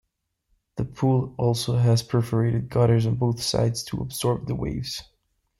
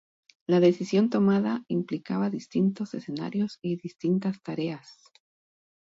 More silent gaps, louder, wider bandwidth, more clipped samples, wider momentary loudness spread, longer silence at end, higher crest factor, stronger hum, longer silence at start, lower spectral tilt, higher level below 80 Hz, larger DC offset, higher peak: neither; first, -24 LUFS vs -27 LUFS; first, 13 kHz vs 7.8 kHz; neither; about the same, 11 LU vs 12 LU; second, 0.55 s vs 1 s; about the same, 16 dB vs 18 dB; neither; first, 0.75 s vs 0.5 s; second, -6.5 dB/octave vs -8 dB/octave; first, -48 dBFS vs -72 dBFS; neither; about the same, -8 dBFS vs -10 dBFS